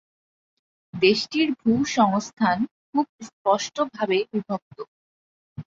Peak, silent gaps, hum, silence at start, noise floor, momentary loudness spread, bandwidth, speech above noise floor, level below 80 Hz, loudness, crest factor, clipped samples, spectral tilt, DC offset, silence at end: -4 dBFS; 2.33-2.37 s, 2.71-2.93 s, 3.09-3.19 s, 3.33-3.45 s, 4.62-4.71 s, 4.88-5.56 s; none; 0.95 s; under -90 dBFS; 17 LU; 7.6 kHz; over 67 dB; -62 dBFS; -23 LUFS; 20 dB; under 0.1%; -4.5 dB/octave; under 0.1%; 0.05 s